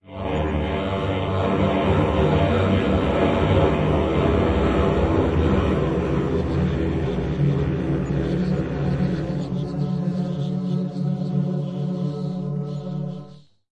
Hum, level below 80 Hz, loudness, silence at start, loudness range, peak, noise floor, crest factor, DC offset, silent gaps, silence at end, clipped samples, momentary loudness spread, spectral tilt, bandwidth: none; -34 dBFS; -22 LUFS; 0.05 s; 6 LU; -6 dBFS; -45 dBFS; 16 dB; under 0.1%; none; 0.3 s; under 0.1%; 7 LU; -8.5 dB/octave; 8.2 kHz